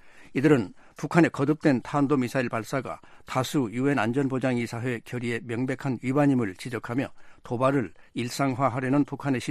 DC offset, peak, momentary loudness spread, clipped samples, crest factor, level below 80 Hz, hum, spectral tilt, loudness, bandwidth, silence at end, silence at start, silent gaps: under 0.1%; -6 dBFS; 11 LU; under 0.1%; 20 dB; -60 dBFS; none; -6.5 dB/octave; -26 LUFS; 14.5 kHz; 0 s; 0.05 s; none